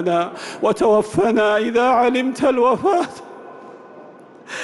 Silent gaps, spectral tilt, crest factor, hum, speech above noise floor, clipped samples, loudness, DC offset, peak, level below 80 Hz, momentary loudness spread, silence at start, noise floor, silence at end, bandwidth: none; -5 dB/octave; 12 dB; none; 25 dB; under 0.1%; -17 LUFS; under 0.1%; -6 dBFS; -56 dBFS; 19 LU; 0 s; -42 dBFS; 0 s; 12 kHz